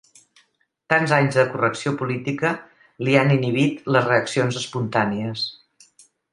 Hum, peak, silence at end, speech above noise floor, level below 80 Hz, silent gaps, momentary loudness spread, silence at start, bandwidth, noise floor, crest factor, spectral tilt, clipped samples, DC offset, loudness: none; 0 dBFS; 0.8 s; 44 dB; -64 dBFS; none; 9 LU; 0.9 s; 11 kHz; -64 dBFS; 22 dB; -6 dB/octave; under 0.1%; under 0.1%; -21 LUFS